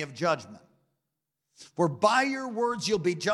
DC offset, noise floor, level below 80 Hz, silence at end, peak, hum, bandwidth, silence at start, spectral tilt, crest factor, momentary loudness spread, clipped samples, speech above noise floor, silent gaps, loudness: under 0.1%; -84 dBFS; -70 dBFS; 0 s; -10 dBFS; none; 12.5 kHz; 0 s; -4.5 dB/octave; 20 dB; 6 LU; under 0.1%; 57 dB; none; -27 LUFS